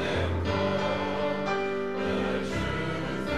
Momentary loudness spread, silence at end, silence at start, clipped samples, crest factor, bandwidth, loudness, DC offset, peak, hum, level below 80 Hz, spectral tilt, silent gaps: 3 LU; 0 s; 0 s; under 0.1%; 14 dB; 13 kHz; -29 LUFS; 0.7%; -14 dBFS; none; -48 dBFS; -6 dB/octave; none